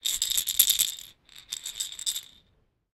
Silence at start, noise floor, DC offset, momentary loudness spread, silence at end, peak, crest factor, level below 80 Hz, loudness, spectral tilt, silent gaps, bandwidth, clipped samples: 0.05 s; -68 dBFS; under 0.1%; 17 LU; 0.7 s; 0 dBFS; 30 dB; -60 dBFS; -25 LUFS; 3.5 dB/octave; none; 17.5 kHz; under 0.1%